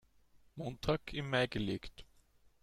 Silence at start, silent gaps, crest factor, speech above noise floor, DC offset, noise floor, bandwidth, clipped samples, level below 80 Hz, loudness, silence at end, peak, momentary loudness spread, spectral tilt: 0.35 s; none; 22 dB; 30 dB; under 0.1%; -67 dBFS; 15 kHz; under 0.1%; -56 dBFS; -38 LUFS; 0.6 s; -18 dBFS; 15 LU; -6 dB/octave